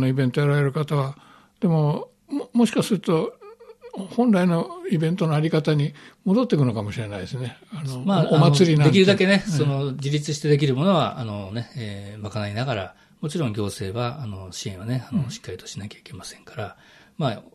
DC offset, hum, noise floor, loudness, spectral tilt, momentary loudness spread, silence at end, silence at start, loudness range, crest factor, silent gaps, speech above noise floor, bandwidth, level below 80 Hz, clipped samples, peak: under 0.1%; none; -45 dBFS; -22 LUFS; -6.5 dB/octave; 18 LU; 0.15 s; 0 s; 10 LU; 20 dB; none; 23 dB; 13 kHz; -60 dBFS; under 0.1%; -2 dBFS